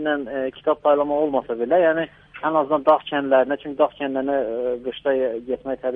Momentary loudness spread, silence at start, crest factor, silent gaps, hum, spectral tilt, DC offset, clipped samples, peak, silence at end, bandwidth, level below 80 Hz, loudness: 8 LU; 0 s; 16 dB; none; none; -8 dB/octave; under 0.1%; under 0.1%; -4 dBFS; 0 s; 3.9 kHz; -58 dBFS; -21 LUFS